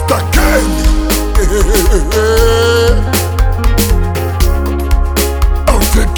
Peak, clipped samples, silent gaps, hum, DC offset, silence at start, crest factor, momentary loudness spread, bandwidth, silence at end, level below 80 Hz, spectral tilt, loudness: 0 dBFS; under 0.1%; none; none; under 0.1%; 0 s; 10 dB; 4 LU; over 20 kHz; 0 s; -12 dBFS; -5 dB/octave; -12 LUFS